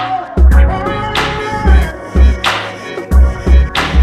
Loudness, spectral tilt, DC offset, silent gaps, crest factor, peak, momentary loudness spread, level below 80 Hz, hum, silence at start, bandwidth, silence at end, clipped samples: -13 LUFS; -6 dB/octave; under 0.1%; none; 10 dB; 0 dBFS; 7 LU; -12 dBFS; none; 0 s; 9.4 kHz; 0 s; under 0.1%